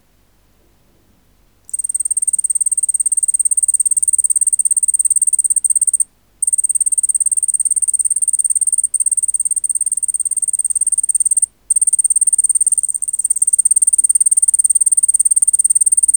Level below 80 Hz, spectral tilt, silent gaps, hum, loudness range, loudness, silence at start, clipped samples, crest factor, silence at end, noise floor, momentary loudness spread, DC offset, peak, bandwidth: -58 dBFS; 2 dB/octave; none; none; 3 LU; -11 LUFS; 1.75 s; under 0.1%; 14 dB; 0 s; -55 dBFS; 5 LU; 0.1%; -2 dBFS; over 20 kHz